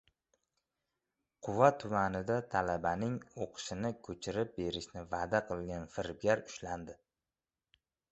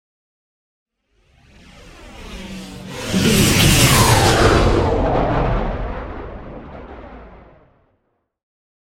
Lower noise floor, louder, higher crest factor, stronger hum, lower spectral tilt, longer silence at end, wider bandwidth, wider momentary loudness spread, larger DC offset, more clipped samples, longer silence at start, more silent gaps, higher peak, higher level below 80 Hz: first, under -90 dBFS vs -68 dBFS; second, -36 LUFS vs -15 LUFS; first, 26 dB vs 20 dB; neither; about the same, -4.5 dB/octave vs -4 dB/octave; second, 1.2 s vs 1.6 s; second, 8 kHz vs 16.5 kHz; second, 14 LU vs 24 LU; neither; neither; second, 1.4 s vs 1.85 s; neither; second, -10 dBFS vs 0 dBFS; second, -60 dBFS vs -28 dBFS